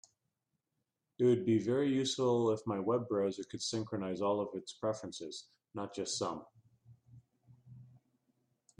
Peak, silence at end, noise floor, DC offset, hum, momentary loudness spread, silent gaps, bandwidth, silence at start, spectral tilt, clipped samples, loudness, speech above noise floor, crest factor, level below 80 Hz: -20 dBFS; 0.95 s; -86 dBFS; under 0.1%; none; 13 LU; none; 10.5 kHz; 1.2 s; -5.5 dB/octave; under 0.1%; -35 LUFS; 52 dB; 18 dB; -78 dBFS